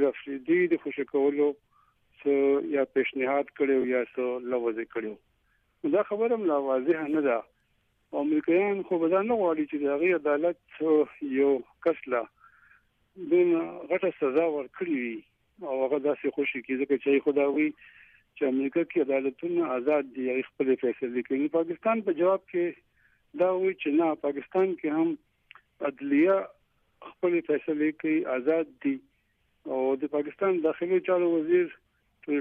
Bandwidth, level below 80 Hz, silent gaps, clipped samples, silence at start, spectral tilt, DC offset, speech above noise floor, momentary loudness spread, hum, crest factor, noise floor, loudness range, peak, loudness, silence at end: 3.7 kHz; -74 dBFS; none; under 0.1%; 0 s; -9 dB/octave; under 0.1%; 44 dB; 8 LU; none; 14 dB; -71 dBFS; 2 LU; -14 dBFS; -27 LUFS; 0 s